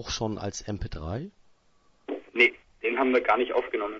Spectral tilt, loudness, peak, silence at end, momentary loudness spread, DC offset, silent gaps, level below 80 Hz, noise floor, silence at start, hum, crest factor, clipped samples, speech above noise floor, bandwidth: -4.5 dB/octave; -27 LUFS; -6 dBFS; 0 s; 16 LU; under 0.1%; none; -48 dBFS; -63 dBFS; 0 s; none; 22 dB; under 0.1%; 36 dB; 7.8 kHz